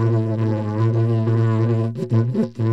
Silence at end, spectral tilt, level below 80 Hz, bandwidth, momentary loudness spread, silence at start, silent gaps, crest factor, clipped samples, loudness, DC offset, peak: 0 s; -10 dB/octave; -62 dBFS; 5.8 kHz; 3 LU; 0 s; none; 12 dB; under 0.1%; -20 LUFS; 0.3%; -8 dBFS